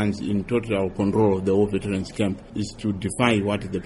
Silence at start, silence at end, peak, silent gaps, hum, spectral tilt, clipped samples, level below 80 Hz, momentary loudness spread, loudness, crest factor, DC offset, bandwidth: 0 s; 0 s; -4 dBFS; none; none; -6.5 dB/octave; under 0.1%; -46 dBFS; 7 LU; -24 LUFS; 18 dB; under 0.1%; 11.5 kHz